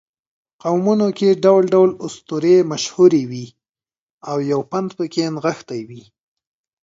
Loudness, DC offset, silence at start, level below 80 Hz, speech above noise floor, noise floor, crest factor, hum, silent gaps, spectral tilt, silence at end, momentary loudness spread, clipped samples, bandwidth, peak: -17 LUFS; under 0.1%; 0.65 s; -66 dBFS; over 73 dB; under -90 dBFS; 18 dB; none; 4.01-4.21 s; -6 dB/octave; 0.85 s; 17 LU; under 0.1%; 7.8 kHz; 0 dBFS